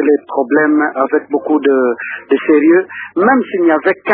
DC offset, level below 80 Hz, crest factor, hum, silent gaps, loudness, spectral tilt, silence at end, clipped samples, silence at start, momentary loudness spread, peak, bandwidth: under 0.1%; -62 dBFS; 12 dB; none; none; -13 LUFS; -10 dB/octave; 0 s; under 0.1%; 0 s; 6 LU; 0 dBFS; 4.3 kHz